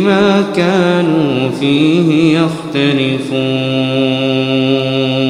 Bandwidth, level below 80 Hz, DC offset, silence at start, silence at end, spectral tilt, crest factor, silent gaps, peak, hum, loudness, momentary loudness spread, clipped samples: 11.5 kHz; -52 dBFS; under 0.1%; 0 s; 0 s; -6.5 dB/octave; 12 dB; none; 0 dBFS; none; -12 LUFS; 4 LU; under 0.1%